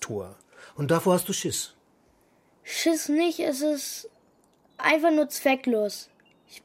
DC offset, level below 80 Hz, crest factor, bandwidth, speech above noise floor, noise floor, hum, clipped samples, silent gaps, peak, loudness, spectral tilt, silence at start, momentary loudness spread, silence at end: under 0.1%; -70 dBFS; 20 dB; 16 kHz; 38 dB; -63 dBFS; none; under 0.1%; none; -8 dBFS; -25 LUFS; -4 dB/octave; 0 s; 16 LU; 0.05 s